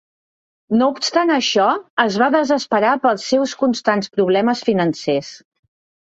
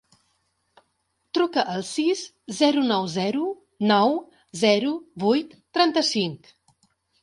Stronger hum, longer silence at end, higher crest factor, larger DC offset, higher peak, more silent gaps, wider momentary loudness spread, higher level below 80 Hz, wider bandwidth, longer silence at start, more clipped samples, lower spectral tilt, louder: neither; about the same, 0.75 s vs 0.85 s; about the same, 16 dB vs 20 dB; neither; first, -2 dBFS vs -6 dBFS; first, 1.90-1.97 s vs none; second, 4 LU vs 10 LU; first, -62 dBFS vs -70 dBFS; second, 8 kHz vs 11.5 kHz; second, 0.7 s vs 1.35 s; neither; about the same, -4.5 dB/octave vs -4.5 dB/octave; first, -17 LUFS vs -23 LUFS